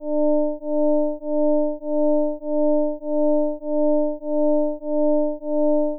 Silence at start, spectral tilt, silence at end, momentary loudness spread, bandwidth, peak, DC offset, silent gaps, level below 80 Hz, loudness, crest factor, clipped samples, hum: 0 s; -15.5 dB/octave; 0 s; 4 LU; 1 kHz; -14 dBFS; under 0.1%; none; -62 dBFS; -22 LUFS; 6 dB; under 0.1%; none